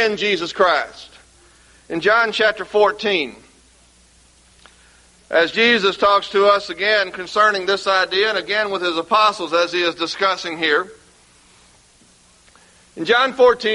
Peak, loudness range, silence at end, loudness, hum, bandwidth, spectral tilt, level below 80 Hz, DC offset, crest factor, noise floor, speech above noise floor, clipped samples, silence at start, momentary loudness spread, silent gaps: -2 dBFS; 6 LU; 0 s; -17 LUFS; none; 11.5 kHz; -3 dB/octave; -58 dBFS; under 0.1%; 18 dB; -52 dBFS; 35 dB; under 0.1%; 0 s; 7 LU; none